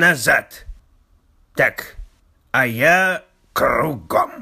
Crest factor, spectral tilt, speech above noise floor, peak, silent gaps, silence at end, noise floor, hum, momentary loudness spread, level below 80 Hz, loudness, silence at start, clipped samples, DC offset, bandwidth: 16 dB; -4 dB/octave; 38 dB; -2 dBFS; none; 0 s; -56 dBFS; none; 16 LU; -44 dBFS; -18 LUFS; 0 s; under 0.1%; under 0.1%; 15.5 kHz